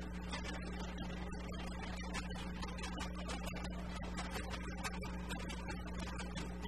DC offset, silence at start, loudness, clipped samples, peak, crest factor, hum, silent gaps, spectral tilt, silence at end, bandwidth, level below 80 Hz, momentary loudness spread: 0.2%; 0 s; -44 LUFS; under 0.1%; -26 dBFS; 18 dB; none; none; -5 dB/octave; 0 s; 13.5 kHz; -48 dBFS; 2 LU